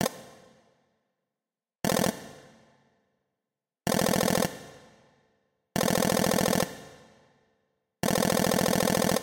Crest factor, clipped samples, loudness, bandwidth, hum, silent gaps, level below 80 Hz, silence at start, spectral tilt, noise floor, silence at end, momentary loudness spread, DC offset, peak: 24 dB; under 0.1%; -27 LUFS; 17 kHz; none; none; -54 dBFS; 0 s; -4 dB/octave; under -90 dBFS; 0 s; 14 LU; under 0.1%; -6 dBFS